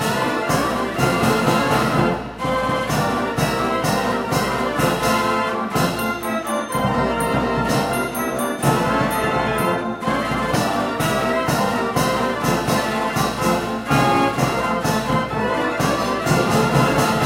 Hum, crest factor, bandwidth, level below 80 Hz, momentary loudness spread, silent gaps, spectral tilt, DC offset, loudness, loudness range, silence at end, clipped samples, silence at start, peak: none; 18 dB; 16 kHz; -40 dBFS; 4 LU; none; -5 dB/octave; under 0.1%; -20 LUFS; 1 LU; 0 s; under 0.1%; 0 s; -2 dBFS